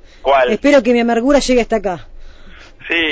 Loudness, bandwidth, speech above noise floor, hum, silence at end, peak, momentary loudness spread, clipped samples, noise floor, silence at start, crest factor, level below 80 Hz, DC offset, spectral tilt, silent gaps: -14 LUFS; 8 kHz; 24 dB; none; 0 s; -2 dBFS; 11 LU; under 0.1%; -37 dBFS; 0.25 s; 12 dB; -36 dBFS; under 0.1%; -4 dB/octave; none